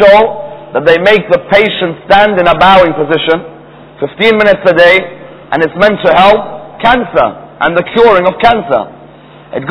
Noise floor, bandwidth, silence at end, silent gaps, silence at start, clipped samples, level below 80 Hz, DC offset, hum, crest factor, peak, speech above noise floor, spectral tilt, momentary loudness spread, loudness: -34 dBFS; 5.4 kHz; 0 s; none; 0 s; 4%; -36 dBFS; 0.5%; none; 8 dB; 0 dBFS; 27 dB; -6.5 dB/octave; 12 LU; -8 LUFS